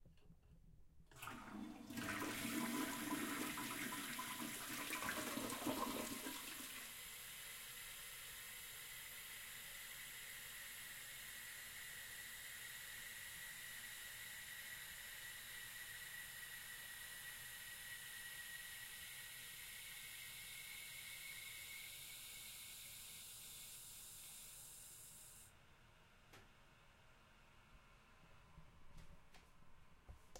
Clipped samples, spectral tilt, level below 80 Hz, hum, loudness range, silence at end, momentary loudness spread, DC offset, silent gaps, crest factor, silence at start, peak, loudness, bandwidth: under 0.1%; -2 dB/octave; -72 dBFS; none; 16 LU; 0 s; 23 LU; under 0.1%; none; 22 dB; 0 s; -30 dBFS; -49 LUFS; 16.5 kHz